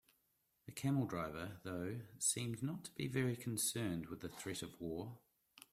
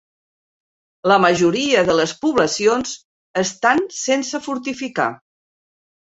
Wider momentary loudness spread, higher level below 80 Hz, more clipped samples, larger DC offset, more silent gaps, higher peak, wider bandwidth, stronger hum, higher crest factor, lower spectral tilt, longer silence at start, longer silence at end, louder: about the same, 11 LU vs 10 LU; second, -72 dBFS vs -56 dBFS; neither; neither; second, none vs 3.05-3.34 s; second, -24 dBFS vs -2 dBFS; first, 16 kHz vs 8.2 kHz; neither; about the same, 20 dB vs 18 dB; about the same, -4.5 dB/octave vs -3.5 dB/octave; second, 0.65 s vs 1.05 s; second, 0.1 s vs 0.95 s; second, -42 LUFS vs -18 LUFS